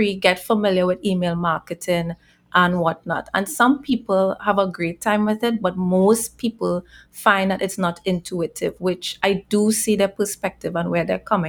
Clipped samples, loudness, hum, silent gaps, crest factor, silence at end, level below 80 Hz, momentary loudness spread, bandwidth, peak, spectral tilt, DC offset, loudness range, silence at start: under 0.1%; -21 LUFS; none; none; 18 dB; 0 s; -52 dBFS; 7 LU; 20 kHz; -2 dBFS; -5 dB/octave; under 0.1%; 2 LU; 0 s